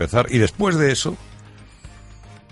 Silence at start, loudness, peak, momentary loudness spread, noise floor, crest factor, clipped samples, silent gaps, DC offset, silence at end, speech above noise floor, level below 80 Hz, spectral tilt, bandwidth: 0 s; -19 LUFS; -2 dBFS; 9 LU; -44 dBFS; 20 dB; under 0.1%; none; under 0.1%; 0.15 s; 25 dB; -42 dBFS; -5 dB/octave; 11.5 kHz